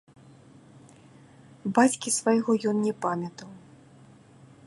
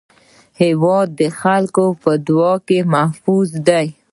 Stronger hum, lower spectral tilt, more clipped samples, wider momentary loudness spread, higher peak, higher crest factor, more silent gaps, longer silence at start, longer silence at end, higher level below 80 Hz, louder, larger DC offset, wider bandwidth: neither; second, -4.5 dB/octave vs -6.5 dB/octave; neither; first, 16 LU vs 3 LU; second, -8 dBFS vs 0 dBFS; first, 22 dB vs 16 dB; neither; first, 1.65 s vs 0.6 s; first, 1.1 s vs 0.2 s; second, -74 dBFS vs -60 dBFS; second, -26 LUFS vs -15 LUFS; neither; about the same, 11.5 kHz vs 11.5 kHz